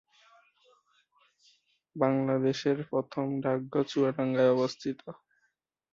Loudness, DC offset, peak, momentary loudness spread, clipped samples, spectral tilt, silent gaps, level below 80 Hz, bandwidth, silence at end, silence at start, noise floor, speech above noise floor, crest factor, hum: -29 LUFS; under 0.1%; -10 dBFS; 12 LU; under 0.1%; -7 dB/octave; none; -74 dBFS; 7.6 kHz; 0.8 s; 1.95 s; -77 dBFS; 49 dB; 20 dB; none